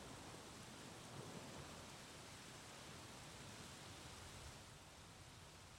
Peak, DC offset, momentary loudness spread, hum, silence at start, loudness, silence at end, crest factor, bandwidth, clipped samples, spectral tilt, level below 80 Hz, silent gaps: -40 dBFS; under 0.1%; 5 LU; none; 0 s; -56 LUFS; 0 s; 16 dB; 16 kHz; under 0.1%; -3.5 dB/octave; -72 dBFS; none